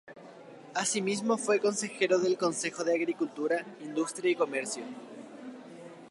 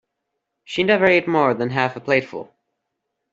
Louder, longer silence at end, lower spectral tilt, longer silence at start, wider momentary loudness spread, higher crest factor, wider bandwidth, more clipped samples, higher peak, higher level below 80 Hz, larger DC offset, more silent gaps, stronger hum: second, -30 LUFS vs -19 LUFS; second, 0 s vs 0.9 s; second, -3.5 dB/octave vs -6 dB/octave; second, 0.05 s vs 0.7 s; first, 20 LU vs 14 LU; about the same, 18 dB vs 18 dB; first, 11.5 kHz vs 7.8 kHz; neither; second, -12 dBFS vs -2 dBFS; second, -84 dBFS vs -60 dBFS; neither; neither; neither